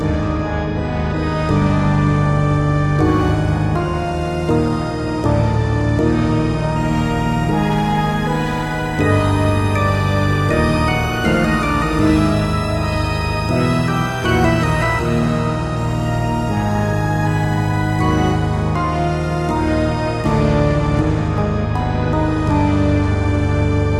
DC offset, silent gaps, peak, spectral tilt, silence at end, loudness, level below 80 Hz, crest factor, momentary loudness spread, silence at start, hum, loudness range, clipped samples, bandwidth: under 0.1%; none; 0 dBFS; -7 dB/octave; 0 s; -17 LUFS; -26 dBFS; 16 dB; 4 LU; 0 s; none; 2 LU; under 0.1%; 13.5 kHz